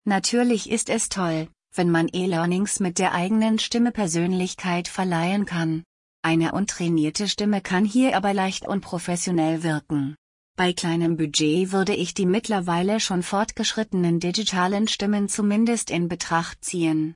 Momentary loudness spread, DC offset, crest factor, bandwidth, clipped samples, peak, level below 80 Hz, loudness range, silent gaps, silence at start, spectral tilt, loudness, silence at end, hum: 5 LU; under 0.1%; 16 dB; 11 kHz; under 0.1%; -8 dBFS; -56 dBFS; 1 LU; 5.86-6.23 s, 10.18-10.54 s; 0.05 s; -4.5 dB/octave; -23 LUFS; 0 s; none